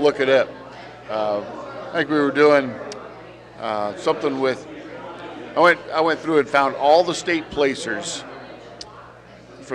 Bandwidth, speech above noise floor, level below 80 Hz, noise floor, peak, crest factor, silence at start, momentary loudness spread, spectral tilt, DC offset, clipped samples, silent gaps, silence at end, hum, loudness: 10.5 kHz; 24 dB; -58 dBFS; -43 dBFS; -4 dBFS; 18 dB; 0 s; 22 LU; -4 dB/octave; under 0.1%; under 0.1%; none; 0 s; none; -20 LUFS